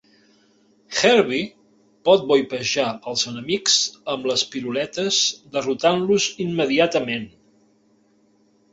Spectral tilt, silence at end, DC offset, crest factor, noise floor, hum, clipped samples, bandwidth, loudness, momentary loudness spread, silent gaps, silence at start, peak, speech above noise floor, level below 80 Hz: -2.5 dB/octave; 1.45 s; under 0.1%; 20 dB; -60 dBFS; none; under 0.1%; 8 kHz; -20 LUFS; 10 LU; none; 0.9 s; -2 dBFS; 39 dB; -62 dBFS